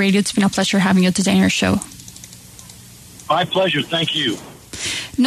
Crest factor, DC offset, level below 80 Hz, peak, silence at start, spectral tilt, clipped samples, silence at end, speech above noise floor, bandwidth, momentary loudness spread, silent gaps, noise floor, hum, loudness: 14 dB; under 0.1%; -50 dBFS; -4 dBFS; 0 s; -4.5 dB/octave; under 0.1%; 0 s; 24 dB; 13.5 kHz; 22 LU; none; -41 dBFS; none; -17 LUFS